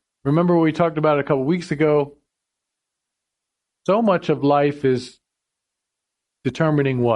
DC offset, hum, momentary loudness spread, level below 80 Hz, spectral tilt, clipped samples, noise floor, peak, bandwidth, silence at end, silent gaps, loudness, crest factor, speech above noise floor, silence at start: under 0.1%; none; 10 LU; -58 dBFS; -8 dB/octave; under 0.1%; -82 dBFS; -4 dBFS; 10.5 kHz; 0 s; none; -19 LUFS; 16 dB; 64 dB; 0.25 s